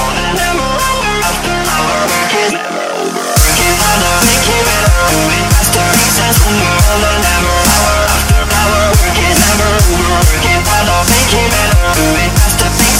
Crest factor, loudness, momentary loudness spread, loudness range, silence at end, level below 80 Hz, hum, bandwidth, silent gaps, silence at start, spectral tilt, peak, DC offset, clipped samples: 10 dB; -10 LUFS; 4 LU; 2 LU; 0 s; -16 dBFS; none; over 20 kHz; none; 0 s; -3 dB/octave; 0 dBFS; under 0.1%; under 0.1%